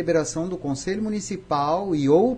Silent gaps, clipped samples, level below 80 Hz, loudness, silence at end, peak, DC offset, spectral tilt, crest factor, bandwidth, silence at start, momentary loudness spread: none; under 0.1%; -50 dBFS; -24 LUFS; 0 s; -6 dBFS; under 0.1%; -6 dB/octave; 16 dB; 10.5 kHz; 0 s; 8 LU